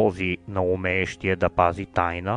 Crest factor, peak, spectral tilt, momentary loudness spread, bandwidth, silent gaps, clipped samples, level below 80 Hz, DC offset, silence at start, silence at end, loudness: 20 dB; -4 dBFS; -6.5 dB/octave; 5 LU; 10.5 kHz; none; under 0.1%; -48 dBFS; under 0.1%; 0 s; 0 s; -24 LUFS